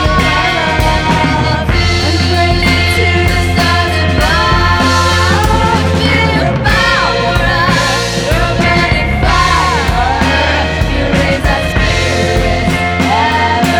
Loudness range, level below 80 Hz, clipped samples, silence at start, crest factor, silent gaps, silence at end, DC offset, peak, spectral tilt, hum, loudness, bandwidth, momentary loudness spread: 2 LU; -20 dBFS; under 0.1%; 0 s; 10 dB; none; 0 s; under 0.1%; 0 dBFS; -5 dB/octave; none; -11 LUFS; over 20 kHz; 3 LU